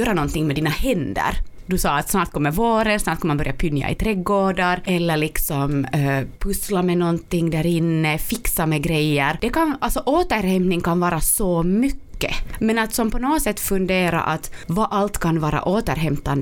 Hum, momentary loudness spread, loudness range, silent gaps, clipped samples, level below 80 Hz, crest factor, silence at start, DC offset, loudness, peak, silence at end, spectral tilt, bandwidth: none; 4 LU; 1 LU; none; under 0.1%; -32 dBFS; 16 dB; 0 s; under 0.1%; -21 LUFS; -4 dBFS; 0 s; -5 dB/octave; 19.5 kHz